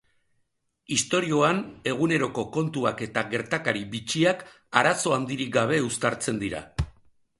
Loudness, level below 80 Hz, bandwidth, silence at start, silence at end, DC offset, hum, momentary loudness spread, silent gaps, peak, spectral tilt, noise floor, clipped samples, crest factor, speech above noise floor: -26 LUFS; -48 dBFS; 11.5 kHz; 0.9 s; 0.5 s; under 0.1%; none; 8 LU; none; -2 dBFS; -4 dB/octave; -73 dBFS; under 0.1%; 24 dB; 48 dB